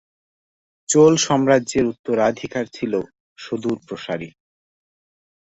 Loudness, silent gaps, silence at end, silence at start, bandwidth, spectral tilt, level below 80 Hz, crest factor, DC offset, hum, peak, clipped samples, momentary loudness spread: -20 LUFS; 1.99-2.04 s, 3.20-3.36 s; 1.2 s; 0.9 s; 8.2 kHz; -4.5 dB/octave; -56 dBFS; 20 dB; under 0.1%; none; -2 dBFS; under 0.1%; 18 LU